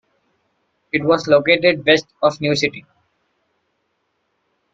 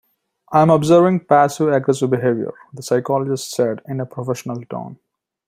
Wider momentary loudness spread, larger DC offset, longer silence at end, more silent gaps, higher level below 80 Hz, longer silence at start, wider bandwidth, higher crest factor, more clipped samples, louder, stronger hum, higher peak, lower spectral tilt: second, 9 LU vs 15 LU; neither; first, 1.95 s vs 0.55 s; neither; about the same, -58 dBFS vs -60 dBFS; first, 0.95 s vs 0.5 s; second, 7.8 kHz vs 16 kHz; about the same, 20 dB vs 16 dB; neither; about the same, -16 LUFS vs -17 LUFS; neither; about the same, 0 dBFS vs -2 dBFS; second, -4.5 dB/octave vs -6.5 dB/octave